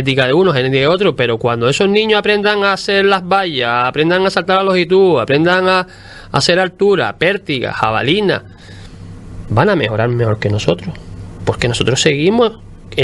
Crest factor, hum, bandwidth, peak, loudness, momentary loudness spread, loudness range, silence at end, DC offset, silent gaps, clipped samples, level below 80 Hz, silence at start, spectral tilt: 14 dB; none; 11.5 kHz; 0 dBFS; -13 LUFS; 8 LU; 4 LU; 0 s; under 0.1%; none; under 0.1%; -40 dBFS; 0 s; -5 dB/octave